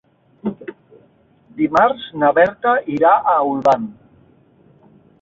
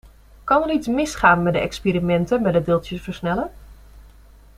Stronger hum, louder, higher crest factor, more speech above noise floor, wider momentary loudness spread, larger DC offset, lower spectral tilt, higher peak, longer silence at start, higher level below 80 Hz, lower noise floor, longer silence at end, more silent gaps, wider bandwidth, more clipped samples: neither; first, -16 LUFS vs -20 LUFS; about the same, 16 dB vs 20 dB; first, 38 dB vs 27 dB; first, 17 LU vs 11 LU; neither; about the same, -6.5 dB/octave vs -6 dB/octave; about the same, -2 dBFS vs -2 dBFS; about the same, 0.45 s vs 0.45 s; second, -58 dBFS vs -42 dBFS; first, -54 dBFS vs -47 dBFS; first, 1.3 s vs 0.55 s; neither; second, 7.4 kHz vs 14 kHz; neither